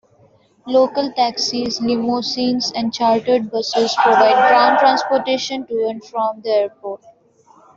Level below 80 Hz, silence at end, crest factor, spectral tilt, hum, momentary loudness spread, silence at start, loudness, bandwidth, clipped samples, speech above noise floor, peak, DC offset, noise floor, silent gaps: -60 dBFS; 0.8 s; 16 dB; -3.5 dB/octave; none; 10 LU; 0.65 s; -17 LUFS; 7.8 kHz; under 0.1%; 37 dB; -2 dBFS; under 0.1%; -53 dBFS; none